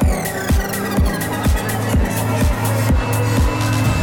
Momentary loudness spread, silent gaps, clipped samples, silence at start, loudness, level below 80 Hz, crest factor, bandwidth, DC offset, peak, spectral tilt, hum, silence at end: 2 LU; none; under 0.1%; 0 s; -18 LUFS; -22 dBFS; 12 dB; 19 kHz; under 0.1%; -6 dBFS; -5.5 dB/octave; none; 0 s